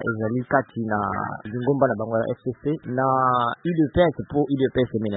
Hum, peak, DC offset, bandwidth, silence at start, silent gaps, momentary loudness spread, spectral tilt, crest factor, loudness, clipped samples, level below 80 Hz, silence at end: none; -4 dBFS; under 0.1%; 4.1 kHz; 0 s; none; 8 LU; -12 dB/octave; 18 dB; -23 LUFS; under 0.1%; -50 dBFS; 0 s